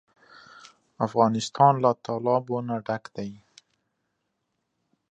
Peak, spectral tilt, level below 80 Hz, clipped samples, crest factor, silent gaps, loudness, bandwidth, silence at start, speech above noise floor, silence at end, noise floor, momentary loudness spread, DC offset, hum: -6 dBFS; -6.5 dB/octave; -70 dBFS; under 0.1%; 22 dB; none; -24 LUFS; 9.6 kHz; 1 s; 54 dB; 1.75 s; -78 dBFS; 15 LU; under 0.1%; none